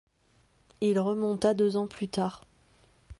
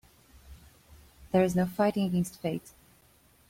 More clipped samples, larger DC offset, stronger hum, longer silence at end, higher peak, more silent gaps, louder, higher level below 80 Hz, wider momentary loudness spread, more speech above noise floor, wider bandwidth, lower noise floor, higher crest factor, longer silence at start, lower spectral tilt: neither; neither; neither; second, 0.05 s vs 0.8 s; about the same, -12 dBFS vs -12 dBFS; neither; about the same, -29 LUFS vs -29 LUFS; about the same, -60 dBFS vs -58 dBFS; about the same, 7 LU vs 9 LU; first, 39 dB vs 34 dB; second, 11.5 kHz vs 16.5 kHz; first, -67 dBFS vs -62 dBFS; about the same, 18 dB vs 20 dB; first, 0.8 s vs 0.5 s; about the same, -6.5 dB/octave vs -7 dB/octave